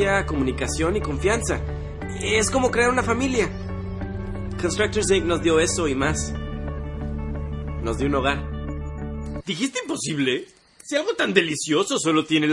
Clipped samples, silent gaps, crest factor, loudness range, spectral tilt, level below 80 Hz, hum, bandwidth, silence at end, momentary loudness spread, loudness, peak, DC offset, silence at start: under 0.1%; none; 20 dB; 5 LU; -4.5 dB/octave; -36 dBFS; none; 11.5 kHz; 0 s; 12 LU; -24 LUFS; -2 dBFS; under 0.1%; 0 s